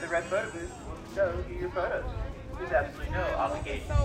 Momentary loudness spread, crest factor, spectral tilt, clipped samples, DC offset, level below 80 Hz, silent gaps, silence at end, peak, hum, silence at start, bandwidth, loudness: 10 LU; 18 dB; -6 dB/octave; under 0.1%; under 0.1%; -38 dBFS; none; 0 s; -14 dBFS; none; 0 s; 12.5 kHz; -32 LUFS